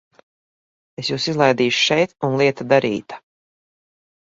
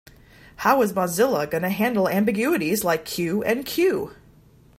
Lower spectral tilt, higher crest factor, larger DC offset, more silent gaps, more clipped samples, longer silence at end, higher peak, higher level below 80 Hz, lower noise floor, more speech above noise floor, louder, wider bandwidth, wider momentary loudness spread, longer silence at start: about the same, -4.5 dB/octave vs -5 dB/octave; about the same, 20 dB vs 20 dB; neither; neither; neither; first, 1.05 s vs 0.65 s; first, 0 dBFS vs -4 dBFS; second, -62 dBFS vs -56 dBFS; first, under -90 dBFS vs -52 dBFS; first, over 72 dB vs 31 dB; first, -18 LUFS vs -22 LUFS; second, 7.8 kHz vs 16 kHz; first, 12 LU vs 5 LU; first, 1 s vs 0.6 s